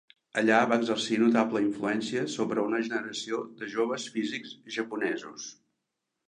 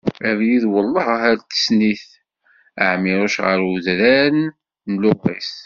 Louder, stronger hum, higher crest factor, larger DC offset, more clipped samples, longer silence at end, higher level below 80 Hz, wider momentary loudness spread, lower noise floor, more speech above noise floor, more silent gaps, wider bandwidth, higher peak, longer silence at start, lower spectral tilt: second, -29 LUFS vs -17 LUFS; neither; first, 22 dB vs 16 dB; neither; neither; first, 0.75 s vs 0.05 s; second, -78 dBFS vs -56 dBFS; first, 12 LU vs 9 LU; first, -84 dBFS vs -57 dBFS; first, 55 dB vs 40 dB; neither; first, 10 kHz vs 7.4 kHz; second, -8 dBFS vs -2 dBFS; first, 0.35 s vs 0.05 s; about the same, -4 dB/octave vs -3.5 dB/octave